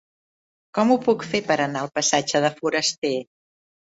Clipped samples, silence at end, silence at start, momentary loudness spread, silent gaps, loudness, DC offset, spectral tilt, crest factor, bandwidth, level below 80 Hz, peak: under 0.1%; 0.75 s; 0.75 s; 7 LU; 2.98-3.02 s; -22 LUFS; under 0.1%; -3 dB/octave; 20 dB; 8 kHz; -66 dBFS; -4 dBFS